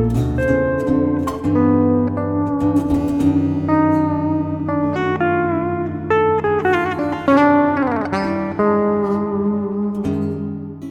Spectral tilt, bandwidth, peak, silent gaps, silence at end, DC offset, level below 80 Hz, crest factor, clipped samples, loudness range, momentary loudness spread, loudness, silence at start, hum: -8.5 dB/octave; 9.8 kHz; -2 dBFS; none; 0 s; under 0.1%; -38 dBFS; 16 dB; under 0.1%; 2 LU; 6 LU; -18 LUFS; 0 s; none